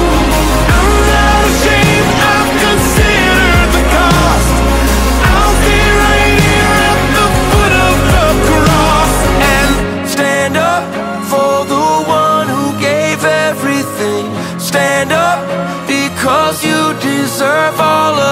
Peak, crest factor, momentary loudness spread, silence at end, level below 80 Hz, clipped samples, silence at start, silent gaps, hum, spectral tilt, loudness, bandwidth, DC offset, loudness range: 0 dBFS; 10 dB; 6 LU; 0 s; -18 dBFS; under 0.1%; 0 s; none; none; -4.5 dB/octave; -10 LUFS; 16.5 kHz; under 0.1%; 4 LU